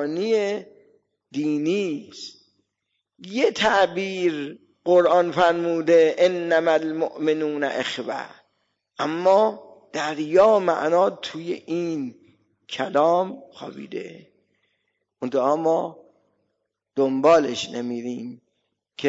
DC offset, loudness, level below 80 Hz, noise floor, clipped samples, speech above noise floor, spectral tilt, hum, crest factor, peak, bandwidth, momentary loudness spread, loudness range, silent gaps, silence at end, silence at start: under 0.1%; -22 LUFS; -66 dBFS; -78 dBFS; under 0.1%; 57 dB; -5 dB/octave; none; 16 dB; -6 dBFS; 7.8 kHz; 17 LU; 8 LU; none; 0 s; 0 s